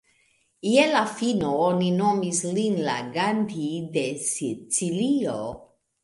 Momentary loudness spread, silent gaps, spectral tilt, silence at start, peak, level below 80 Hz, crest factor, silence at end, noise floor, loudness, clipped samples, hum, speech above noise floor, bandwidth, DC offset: 8 LU; none; -4.5 dB/octave; 0.65 s; -6 dBFS; -62 dBFS; 20 dB; 0.4 s; -66 dBFS; -24 LUFS; under 0.1%; none; 42 dB; 11.5 kHz; under 0.1%